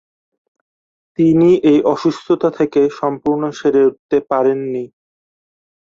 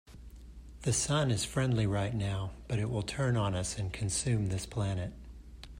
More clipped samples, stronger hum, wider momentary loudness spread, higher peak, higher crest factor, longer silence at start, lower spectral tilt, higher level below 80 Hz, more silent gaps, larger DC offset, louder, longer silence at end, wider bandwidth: neither; neither; second, 10 LU vs 22 LU; first, -2 dBFS vs -18 dBFS; about the same, 14 dB vs 14 dB; first, 1.2 s vs 0.1 s; first, -7.5 dB/octave vs -5 dB/octave; second, -56 dBFS vs -50 dBFS; first, 3.99-4.09 s vs none; neither; first, -15 LUFS vs -33 LUFS; first, 1 s vs 0 s; second, 7.6 kHz vs 16 kHz